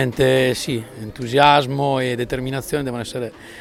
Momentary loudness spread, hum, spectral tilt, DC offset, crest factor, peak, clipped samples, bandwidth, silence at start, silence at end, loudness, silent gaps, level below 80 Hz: 15 LU; none; -5 dB/octave; under 0.1%; 20 dB; 0 dBFS; under 0.1%; 16.5 kHz; 0 s; 0 s; -19 LUFS; none; -46 dBFS